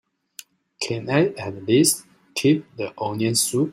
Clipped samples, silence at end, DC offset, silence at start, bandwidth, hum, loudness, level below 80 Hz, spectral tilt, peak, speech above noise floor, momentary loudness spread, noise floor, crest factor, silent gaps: under 0.1%; 0 s; under 0.1%; 0.8 s; 16 kHz; none; -22 LUFS; -64 dBFS; -4 dB/octave; -4 dBFS; 25 dB; 15 LU; -46 dBFS; 18 dB; none